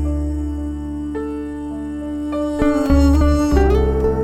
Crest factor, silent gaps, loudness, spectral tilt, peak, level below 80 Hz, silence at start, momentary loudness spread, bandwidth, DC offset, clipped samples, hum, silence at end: 14 dB; none; -19 LUFS; -8 dB/octave; -2 dBFS; -22 dBFS; 0 s; 12 LU; 13 kHz; under 0.1%; under 0.1%; none; 0 s